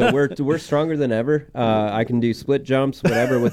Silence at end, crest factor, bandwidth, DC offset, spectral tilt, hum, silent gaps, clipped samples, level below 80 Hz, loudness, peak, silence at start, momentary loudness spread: 0 s; 12 dB; 15 kHz; under 0.1%; -7 dB/octave; none; none; under 0.1%; -50 dBFS; -20 LUFS; -8 dBFS; 0 s; 3 LU